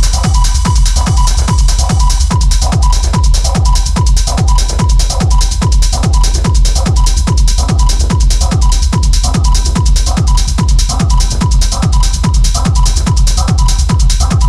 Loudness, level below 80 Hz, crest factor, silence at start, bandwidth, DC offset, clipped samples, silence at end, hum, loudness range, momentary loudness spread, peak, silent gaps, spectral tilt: -11 LUFS; -10 dBFS; 8 dB; 0 s; 12.5 kHz; under 0.1%; under 0.1%; 0 s; none; 0 LU; 1 LU; 0 dBFS; none; -4.5 dB/octave